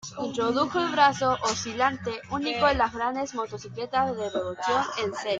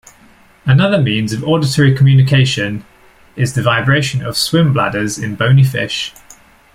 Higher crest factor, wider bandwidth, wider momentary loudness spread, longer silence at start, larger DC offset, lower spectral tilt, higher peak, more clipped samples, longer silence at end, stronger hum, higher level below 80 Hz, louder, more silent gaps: first, 20 dB vs 12 dB; second, 9.4 kHz vs 14.5 kHz; about the same, 10 LU vs 10 LU; second, 0.05 s vs 0.65 s; neither; second, -3.5 dB/octave vs -5.5 dB/octave; second, -6 dBFS vs -2 dBFS; neither; second, 0 s vs 0.65 s; neither; second, -52 dBFS vs -46 dBFS; second, -26 LUFS vs -13 LUFS; neither